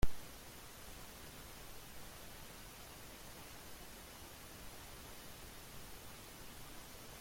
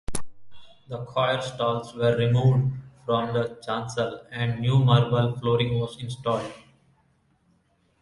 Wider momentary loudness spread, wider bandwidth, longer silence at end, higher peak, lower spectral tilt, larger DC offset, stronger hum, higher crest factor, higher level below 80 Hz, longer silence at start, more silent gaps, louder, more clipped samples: second, 1 LU vs 12 LU; first, 16.5 kHz vs 11.5 kHz; second, 0 s vs 1.4 s; second, -18 dBFS vs -6 dBFS; second, -3.5 dB/octave vs -6.5 dB/octave; neither; neither; about the same, 24 dB vs 20 dB; about the same, -54 dBFS vs -52 dBFS; about the same, 0 s vs 0.1 s; neither; second, -53 LUFS vs -25 LUFS; neither